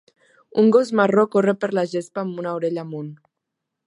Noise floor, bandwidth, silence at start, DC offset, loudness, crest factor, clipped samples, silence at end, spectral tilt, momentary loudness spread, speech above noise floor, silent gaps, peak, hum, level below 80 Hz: -81 dBFS; 11 kHz; 0.55 s; under 0.1%; -20 LUFS; 18 dB; under 0.1%; 0.7 s; -7 dB/octave; 13 LU; 62 dB; none; -4 dBFS; none; -72 dBFS